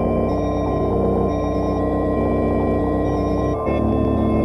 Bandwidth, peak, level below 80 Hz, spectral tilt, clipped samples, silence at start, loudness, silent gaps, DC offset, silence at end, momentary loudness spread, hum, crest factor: 10 kHz; -6 dBFS; -28 dBFS; -9.5 dB/octave; under 0.1%; 0 s; -20 LUFS; none; under 0.1%; 0 s; 2 LU; none; 12 dB